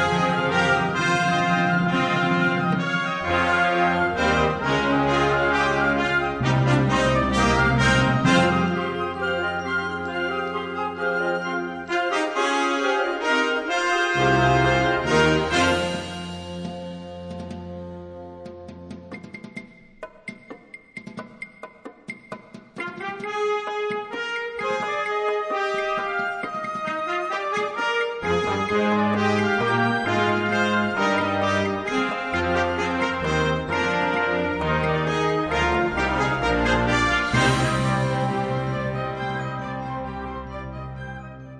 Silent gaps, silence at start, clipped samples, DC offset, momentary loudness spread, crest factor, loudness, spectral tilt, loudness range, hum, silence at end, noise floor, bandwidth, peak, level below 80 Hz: none; 0 s; under 0.1%; under 0.1%; 18 LU; 16 dB; -22 LUFS; -5.5 dB/octave; 16 LU; none; 0 s; -43 dBFS; 11 kHz; -6 dBFS; -42 dBFS